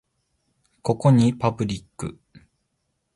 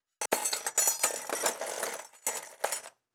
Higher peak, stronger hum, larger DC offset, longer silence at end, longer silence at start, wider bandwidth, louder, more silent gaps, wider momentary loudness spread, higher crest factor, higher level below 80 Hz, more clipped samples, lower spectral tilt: first, -6 dBFS vs -12 dBFS; neither; neither; first, 0.75 s vs 0.25 s; first, 0.85 s vs 0.2 s; second, 11.5 kHz vs over 20 kHz; first, -22 LUFS vs -31 LUFS; neither; first, 18 LU vs 9 LU; about the same, 20 dB vs 22 dB; first, -54 dBFS vs under -90 dBFS; neither; first, -7.5 dB/octave vs 1 dB/octave